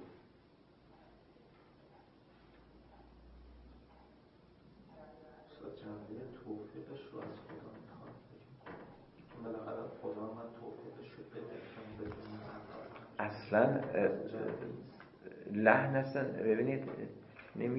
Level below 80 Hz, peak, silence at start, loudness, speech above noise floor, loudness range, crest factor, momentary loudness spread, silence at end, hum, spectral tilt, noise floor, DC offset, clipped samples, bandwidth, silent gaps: -70 dBFS; -10 dBFS; 0 s; -38 LUFS; 31 dB; 19 LU; 30 dB; 26 LU; 0 s; none; -6 dB/octave; -65 dBFS; under 0.1%; under 0.1%; 5.6 kHz; none